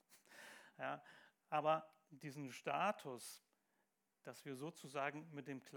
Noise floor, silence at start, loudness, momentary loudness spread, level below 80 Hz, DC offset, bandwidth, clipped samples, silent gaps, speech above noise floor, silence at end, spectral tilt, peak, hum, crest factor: -86 dBFS; 0.1 s; -46 LUFS; 20 LU; under -90 dBFS; under 0.1%; 19.5 kHz; under 0.1%; none; 41 dB; 0 s; -4.5 dB/octave; -26 dBFS; none; 22 dB